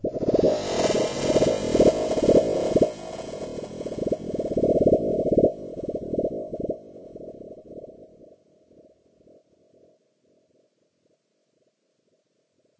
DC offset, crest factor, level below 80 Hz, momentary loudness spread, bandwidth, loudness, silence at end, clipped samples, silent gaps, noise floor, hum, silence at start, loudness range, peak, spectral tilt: under 0.1%; 20 dB; -48 dBFS; 22 LU; 8 kHz; -24 LUFS; 4.75 s; under 0.1%; none; -71 dBFS; none; 0.05 s; 17 LU; -6 dBFS; -6 dB/octave